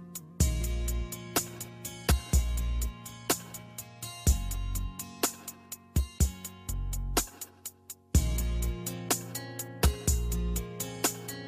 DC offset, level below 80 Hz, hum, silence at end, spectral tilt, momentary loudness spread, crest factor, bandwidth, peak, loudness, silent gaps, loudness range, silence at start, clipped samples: under 0.1%; -34 dBFS; none; 0 s; -4 dB/octave; 13 LU; 18 dB; 15.5 kHz; -14 dBFS; -32 LUFS; none; 2 LU; 0 s; under 0.1%